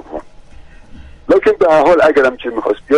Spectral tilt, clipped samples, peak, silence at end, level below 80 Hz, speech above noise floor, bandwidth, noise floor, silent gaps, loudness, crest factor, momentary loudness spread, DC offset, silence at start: -5.5 dB/octave; under 0.1%; -2 dBFS; 0 s; -40 dBFS; 25 dB; 10.5 kHz; -36 dBFS; none; -12 LUFS; 12 dB; 21 LU; under 0.1%; 0.1 s